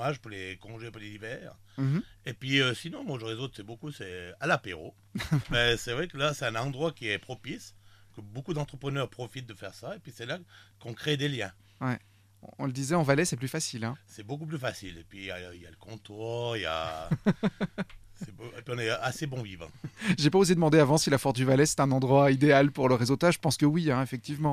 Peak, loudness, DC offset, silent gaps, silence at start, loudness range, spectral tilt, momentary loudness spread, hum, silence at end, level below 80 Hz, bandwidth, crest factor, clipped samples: -8 dBFS; -28 LUFS; under 0.1%; none; 0 s; 12 LU; -5 dB/octave; 20 LU; none; 0 s; -54 dBFS; 14.5 kHz; 20 dB; under 0.1%